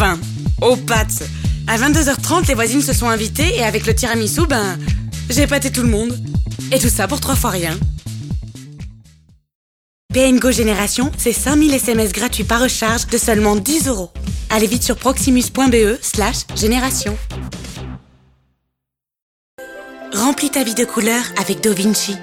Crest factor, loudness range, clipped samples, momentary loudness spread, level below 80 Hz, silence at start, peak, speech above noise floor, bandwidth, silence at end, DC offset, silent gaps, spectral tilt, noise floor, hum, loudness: 16 dB; 7 LU; under 0.1%; 13 LU; -28 dBFS; 0 s; 0 dBFS; 65 dB; 17.5 kHz; 0 s; under 0.1%; 9.55-10.09 s, 19.22-19.58 s; -4 dB/octave; -81 dBFS; none; -16 LUFS